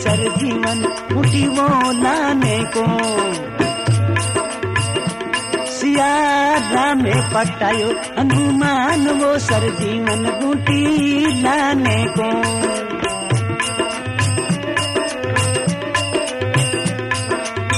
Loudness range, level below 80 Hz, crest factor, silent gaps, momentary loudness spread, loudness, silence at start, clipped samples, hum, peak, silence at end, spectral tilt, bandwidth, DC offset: 3 LU; -46 dBFS; 14 dB; none; 5 LU; -17 LUFS; 0 s; under 0.1%; none; -2 dBFS; 0 s; -4.5 dB/octave; 13.5 kHz; under 0.1%